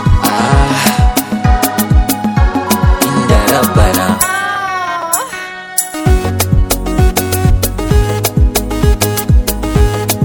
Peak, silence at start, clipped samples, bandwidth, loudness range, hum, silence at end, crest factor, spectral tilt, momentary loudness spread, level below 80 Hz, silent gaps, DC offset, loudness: 0 dBFS; 0 s; 0.4%; over 20 kHz; 2 LU; none; 0 s; 12 dB; -5 dB/octave; 5 LU; -16 dBFS; none; under 0.1%; -12 LUFS